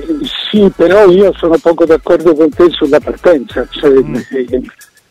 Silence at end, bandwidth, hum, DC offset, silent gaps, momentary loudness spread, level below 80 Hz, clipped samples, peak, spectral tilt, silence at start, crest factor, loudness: 0.4 s; 12.5 kHz; none; under 0.1%; none; 10 LU; -36 dBFS; under 0.1%; 0 dBFS; -6.5 dB/octave; 0 s; 10 dB; -10 LUFS